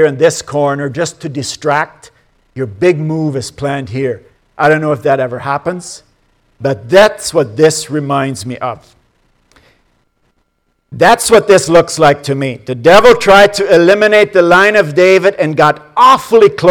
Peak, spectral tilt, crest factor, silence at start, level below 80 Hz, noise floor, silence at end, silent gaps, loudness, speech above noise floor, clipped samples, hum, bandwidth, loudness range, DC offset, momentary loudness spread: 0 dBFS; -4.5 dB/octave; 10 dB; 0 s; -44 dBFS; -62 dBFS; 0 s; none; -10 LUFS; 52 dB; 1%; none; 19 kHz; 9 LU; under 0.1%; 13 LU